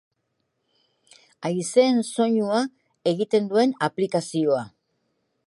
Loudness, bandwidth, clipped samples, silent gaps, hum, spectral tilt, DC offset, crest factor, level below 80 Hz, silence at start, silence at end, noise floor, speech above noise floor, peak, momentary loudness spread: -23 LUFS; 11.5 kHz; under 0.1%; none; none; -5 dB/octave; under 0.1%; 20 dB; -76 dBFS; 1.4 s; 0.8 s; -75 dBFS; 53 dB; -6 dBFS; 9 LU